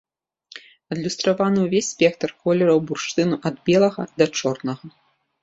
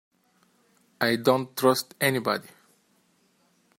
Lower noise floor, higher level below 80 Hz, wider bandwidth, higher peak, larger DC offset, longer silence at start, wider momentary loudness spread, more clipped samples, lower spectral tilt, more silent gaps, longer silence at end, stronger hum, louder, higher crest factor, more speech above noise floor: second, -52 dBFS vs -66 dBFS; first, -62 dBFS vs -72 dBFS; second, 8 kHz vs 16.5 kHz; first, -2 dBFS vs -6 dBFS; neither; second, 0.55 s vs 1 s; first, 15 LU vs 6 LU; neither; about the same, -5 dB/octave vs -4 dB/octave; neither; second, 0.55 s vs 1.35 s; neither; first, -21 LUFS vs -25 LUFS; about the same, 18 dB vs 22 dB; second, 32 dB vs 42 dB